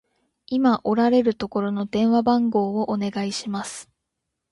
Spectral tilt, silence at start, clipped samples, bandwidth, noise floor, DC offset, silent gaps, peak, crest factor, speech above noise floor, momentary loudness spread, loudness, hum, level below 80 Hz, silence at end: -6 dB/octave; 0.5 s; under 0.1%; 11.5 kHz; -80 dBFS; under 0.1%; none; -8 dBFS; 16 dB; 59 dB; 10 LU; -22 LUFS; none; -60 dBFS; 0.7 s